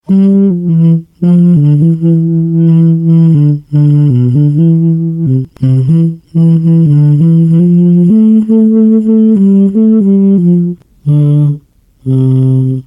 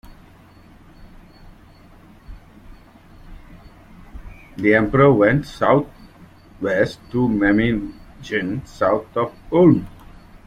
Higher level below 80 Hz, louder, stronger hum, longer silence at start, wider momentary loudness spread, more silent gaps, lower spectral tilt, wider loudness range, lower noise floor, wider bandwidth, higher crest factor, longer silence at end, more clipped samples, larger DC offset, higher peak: second, -48 dBFS vs -42 dBFS; first, -8 LUFS vs -18 LUFS; neither; second, 0.1 s vs 1 s; second, 5 LU vs 14 LU; neither; first, -12 dB/octave vs -8 dB/octave; about the same, 2 LU vs 4 LU; second, -36 dBFS vs -47 dBFS; second, 3.3 kHz vs 10.5 kHz; second, 6 dB vs 20 dB; second, 0.05 s vs 0.6 s; neither; neither; about the same, 0 dBFS vs -2 dBFS